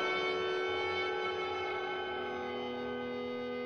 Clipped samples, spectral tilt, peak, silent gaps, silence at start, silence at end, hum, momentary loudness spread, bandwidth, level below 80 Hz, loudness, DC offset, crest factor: under 0.1%; -4.5 dB/octave; -22 dBFS; none; 0 s; 0 s; none; 6 LU; 8 kHz; -68 dBFS; -36 LUFS; under 0.1%; 14 dB